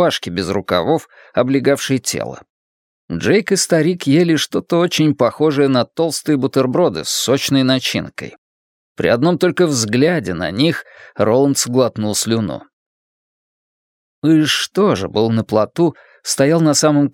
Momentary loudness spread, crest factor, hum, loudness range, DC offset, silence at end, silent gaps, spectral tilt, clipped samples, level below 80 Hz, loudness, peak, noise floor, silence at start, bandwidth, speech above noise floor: 8 LU; 16 dB; none; 3 LU; under 0.1%; 0.05 s; 2.50-3.08 s, 8.38-8.95 s, 12.73-14.22 s; -4.5 dB/octave; under 0.1%; -54 dBFS; -16 LUFS; 0 dBFS; under -90 dBFS; 0 s; 17.5 kHz; over 74 dB